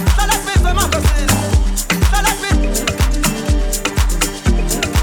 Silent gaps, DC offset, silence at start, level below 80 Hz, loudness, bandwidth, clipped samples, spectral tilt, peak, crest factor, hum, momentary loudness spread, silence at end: none; under 0.1%; 0 s; -16 dBFS; -16 LUFS; over 20 kHz; under 0.1%; -4 dB/octave; -2 dBFS; 12 dB; none; 3 LU; 0 s